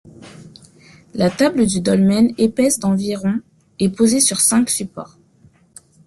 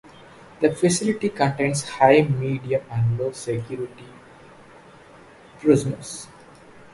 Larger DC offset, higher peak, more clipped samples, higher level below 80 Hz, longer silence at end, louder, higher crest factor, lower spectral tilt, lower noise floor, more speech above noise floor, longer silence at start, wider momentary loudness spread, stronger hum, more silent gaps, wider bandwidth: neither; about the same, -2 dBFS vs 0 dBFS; neither; about the same, -52 dBFS vs -56 dBFS; first, 1 s vs 0.7 s; first, -16 LUFS vs -22 LUFS; second, 16 dB vs 22 dB; about the same, -4.5 dB/octave vs -5.5 dB/octave; first, -52 dBFS vs -48 dBFS; first, 36 dB vs 26 dB; second, 0.2 s vs 0.6 s; second, 9 LU vs 16 LU; neither; neither; about the same, 12.5 kHz vs 11.5 kHz